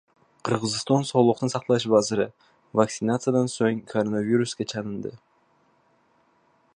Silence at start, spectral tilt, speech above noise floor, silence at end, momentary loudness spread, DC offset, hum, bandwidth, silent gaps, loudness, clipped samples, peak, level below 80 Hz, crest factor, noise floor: 0.45 s; -5.5 dB/octave; 40 dB; 1.6 s; 10 LU; under 0.1%; none; 10.5 kHz; none; -24 LUFS; under 0.1%; -4 dBFS; -64 dBFS; 22 dB; -64 dBFS